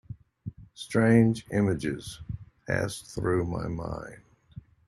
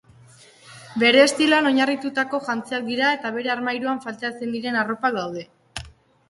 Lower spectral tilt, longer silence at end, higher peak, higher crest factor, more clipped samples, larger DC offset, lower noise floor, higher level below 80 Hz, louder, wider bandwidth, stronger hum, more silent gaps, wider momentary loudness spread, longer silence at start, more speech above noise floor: first, -7 dB/octave vs -3 dB/octave; about the same, 0.3 s vs 0.4 s; second, -8 dBFS vs -2 dBFS; about the same, 20 dB vs 20 dB; neither; neither; about the same, -49 dBFS vs -50 dBFS; first, -52 dBFS vs -58 dBFS; second, -27 LUFS vs -21 LUFS; about the same, 12.5 kHz vs 11.5 kHz; neither; neither; first, 21 LU vs 17 LU; second, 0.1 s vs 0.65 s; second, 23 dB vs 29 dB